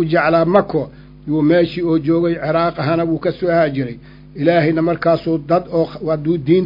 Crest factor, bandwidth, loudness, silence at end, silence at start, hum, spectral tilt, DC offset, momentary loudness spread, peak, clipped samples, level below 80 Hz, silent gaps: 16 dB; 5.4 kHz; -16 LUFS; 0 s; 0 s; none; -10 dB/octave; under 0.1%; 9 LU; 0 dBFS; under 0.1%; -46 dBFS; none